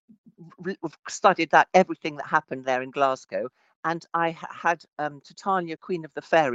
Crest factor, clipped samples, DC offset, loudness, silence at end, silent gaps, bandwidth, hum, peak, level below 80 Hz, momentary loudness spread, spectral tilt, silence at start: 22 dB; under 0.1%; under 0.1%; -25 LUFS; 0 s; 3.76-3.83 s; 8.6 kHz; none; -4 dBFS; -74 dBFS; 14 LU; -4.5 dB/octave; 0.4 s